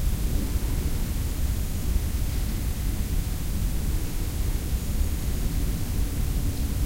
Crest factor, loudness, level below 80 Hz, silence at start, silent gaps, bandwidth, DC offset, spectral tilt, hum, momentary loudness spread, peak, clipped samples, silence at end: 14 dB; -29 LUFS; -26 dBFS; 0 s; none; 16 kHz; under 0.1%; -5.5 dB/octave; none; 1 LU; -12 dBFS; under 0.1%; 0 s